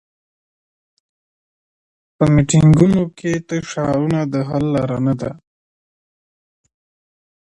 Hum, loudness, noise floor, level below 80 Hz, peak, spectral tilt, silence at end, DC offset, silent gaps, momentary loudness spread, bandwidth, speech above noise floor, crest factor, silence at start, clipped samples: none; -16 LUFS; under -90 dBFS; -44 dBFS; 0 dBFS; -7 dB/octave; 2.15 s; under 0.1%; none; 11 LU; 10.5 kHz; over 75 dB; 18 dB; 2.2 s; under 0.1%